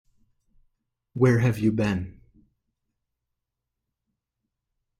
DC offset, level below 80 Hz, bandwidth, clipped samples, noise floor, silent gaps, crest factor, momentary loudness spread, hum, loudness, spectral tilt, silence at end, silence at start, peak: under 0.1%; -56 dBFS; 14 kHz; under 0.1%; -84 dBFS; none; 22 dB; 18 LU; none; -23 LUFS; -8 dB/octave; 2.9 s; 1.15 s; -8 dBFS